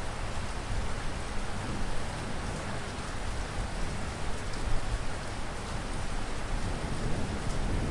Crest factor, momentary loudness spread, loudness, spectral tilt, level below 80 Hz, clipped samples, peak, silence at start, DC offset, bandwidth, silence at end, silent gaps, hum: 16 dB; 3 LU; -36 LUFS; -5 dB/octave; -36 dBFS; under 0.1%; -16 dBFS; 0 s; under 0.1%; 11.5 kHz; 0 s; none; none